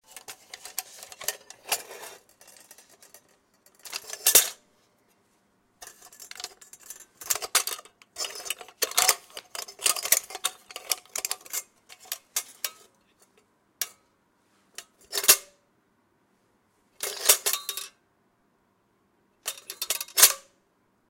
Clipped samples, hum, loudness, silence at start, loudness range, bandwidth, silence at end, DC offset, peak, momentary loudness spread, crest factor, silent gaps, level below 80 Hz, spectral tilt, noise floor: under 0.1%; none; -25 LUFS; 0.15 s; 11 LU; 17 kHz; 0.7 s; under 0.1%; 0 dBFS; 25 LU; 30 dB; none; -72 dBFS; 2.5 dB/octave; -69 dBFS